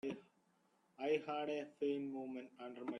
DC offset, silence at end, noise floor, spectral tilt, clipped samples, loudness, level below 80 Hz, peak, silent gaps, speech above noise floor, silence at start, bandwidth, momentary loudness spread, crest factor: under 0.1%; 0 s; -77 dBFS; -6 dB/octave; under 0.1%; -43 LUFS; -88 dBFS; -26 dBFS; none; 34 dB; 0.05 s; 9.8 kHz; 11 LU; 18 dB